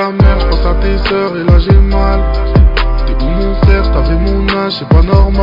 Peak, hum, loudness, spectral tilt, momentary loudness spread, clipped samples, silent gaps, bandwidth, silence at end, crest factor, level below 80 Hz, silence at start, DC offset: 0 dBFS; none; -11 LUFS; -9 dB/octave; 6 LU; 2%; none; 5.4 kHz; 0 s; 8 dB; -10 dBFS; 0 s; under 0.1%